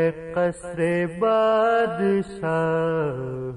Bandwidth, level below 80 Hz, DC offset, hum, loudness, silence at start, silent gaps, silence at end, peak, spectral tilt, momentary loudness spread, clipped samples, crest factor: 10 kHz; -54 dBFS; under 0.1%; none; -23 LUFS; 0 s; none; 0 s; -10 dBFS; -7 dB/octave; 7 LU; under 0.1%; 12 dB